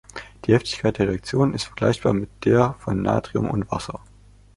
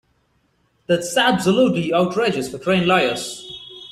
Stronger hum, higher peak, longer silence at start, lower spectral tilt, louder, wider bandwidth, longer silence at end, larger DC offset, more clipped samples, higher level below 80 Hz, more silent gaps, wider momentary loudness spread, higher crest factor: neither; about the same, -2 dBFS vs -4 dBFS; second, 0.15 s vs 0.9 s; first, -6.5 dB/octave vs -4.5 dB/octave; second, -22 LUFS vs -18 LUFS; second, 11.5 kHz vs 14.5 kHz; first, 0.6 s vs 0.05 s; neither; neither; first, -44 dBFS vs -56 dBFS; neither; second, 10 LU vs 13 LU; about the same, 20 dB vs 16 dB